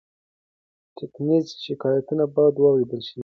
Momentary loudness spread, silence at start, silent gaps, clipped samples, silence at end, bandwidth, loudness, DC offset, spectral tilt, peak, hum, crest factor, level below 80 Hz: 13 LU; 1 s; none; under 0.1%; 0 s; 6.6 kHz; -22 LUFS; under 0.1%; -8 dB/octave; -6 dBFS; none; 16 dB; -70 dBFS